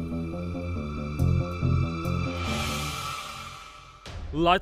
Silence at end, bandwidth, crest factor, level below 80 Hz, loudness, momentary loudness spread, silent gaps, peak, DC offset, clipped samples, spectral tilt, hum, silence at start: 0 s; 15.5 kHz; 20 dB; -38 dBFS; -29 LUFS; 15 LU; none; -8 dBFS; under 0.1%; under 0.1%; -5.5 dB/octave; none; 0 s